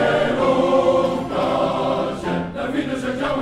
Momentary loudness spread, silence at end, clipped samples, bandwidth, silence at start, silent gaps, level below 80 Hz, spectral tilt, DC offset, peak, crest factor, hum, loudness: 8 LU; 0 s; under 0.1%; 12 kHz; 0 s; none; -46 dBFS; -6 dB/octave; 0.2%; -6 dBFS; 14 dB; none; -20 LUFS